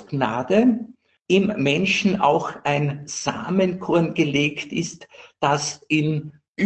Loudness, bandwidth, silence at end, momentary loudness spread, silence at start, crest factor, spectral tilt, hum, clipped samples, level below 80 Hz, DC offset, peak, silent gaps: -21 LUFS; 8.8 kHz; 0 s; 10 LU; 0 s; 18 dB; -5 dB/octave; none; under 0.1%; -60 dBFS; under 0.1%; -4 dBFS; 6.48-6.55 s